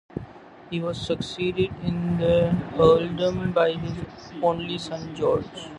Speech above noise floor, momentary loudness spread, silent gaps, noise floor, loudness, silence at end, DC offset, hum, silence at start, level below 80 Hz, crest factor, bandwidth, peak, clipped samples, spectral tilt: 20 dB; 14 LU; none; -44 dBFS; -24 LUFS; 0 s; under 0.1%; none; 0.15 s; -46 dBFS; 20 dB; 10.5 kHz; -4 dBFS; under 0.1%; -7 dB/octave